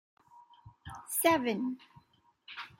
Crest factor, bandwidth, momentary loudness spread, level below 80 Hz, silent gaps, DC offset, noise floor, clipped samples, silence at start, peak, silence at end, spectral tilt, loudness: 22 dB; 16 kHz; 21 LU; -70 dBFS; none; under 0.1%; -68 dBFS; under 0.1%; 0.65 s; -14 dBFS; 0.15 s; -3 dB/octave; -30 LUFS